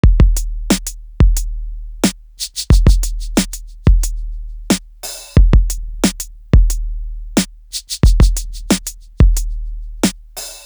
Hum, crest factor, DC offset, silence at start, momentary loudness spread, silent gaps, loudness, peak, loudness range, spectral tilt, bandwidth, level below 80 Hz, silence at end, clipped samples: none; 14 dB; under 0.1%; 0.05 s; 16 LU; none; -17 LUFS; 0 dBFS; 1 LU; -5 dB/octave; over 20 kHz; -16 dBFS; 0.05 s; under 0.1%